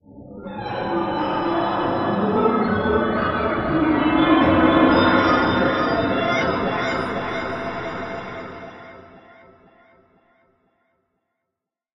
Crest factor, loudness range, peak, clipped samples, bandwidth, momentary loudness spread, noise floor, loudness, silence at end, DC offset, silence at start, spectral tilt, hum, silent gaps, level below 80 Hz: 18 dB; 15 LU; -4 dBFS; under 0.1%; 7.4 kHz; 17 LU; -83 dBFS; -20 LUFS; 2.8 s; under 0.1%; 0.1 s; -7 dB/octave; none; none; -44 dBFS